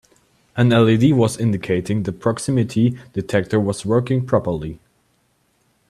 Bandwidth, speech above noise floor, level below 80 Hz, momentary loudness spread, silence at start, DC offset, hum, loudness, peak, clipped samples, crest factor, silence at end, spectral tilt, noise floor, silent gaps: 13 kHz; 46 dB; -50 dBFS; 10 LU; 0.55 s; under 0.1%; none; -19 LUFS; -2 dBFS; under 0.1%; 18 dB; 1.15 s; -7 dB/octave; -63 dBFS; none